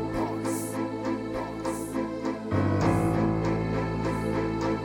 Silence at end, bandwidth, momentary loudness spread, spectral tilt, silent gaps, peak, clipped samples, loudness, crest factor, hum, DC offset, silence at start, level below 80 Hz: 0 s; 17 kHz; 7 LU; -7 dB/octave; none; -12 dBFS; under 0.1%; -28 LUFS; 16 dB; none; under 0.1%; 0 s; -44 dBFS